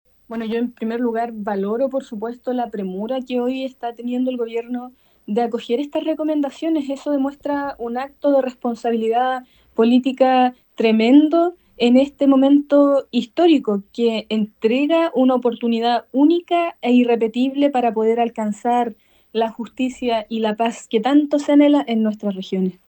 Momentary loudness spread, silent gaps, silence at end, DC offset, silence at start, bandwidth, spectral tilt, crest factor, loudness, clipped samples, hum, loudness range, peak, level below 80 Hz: 10 LU; none; 0.15 s; under 0.1%; 0.3 s; 19 kHz; -6.5 dB/octave; 16 dB; -19 LUFS; under 0.1%; none; 8 LU; -2 dBFS; -62 dBFS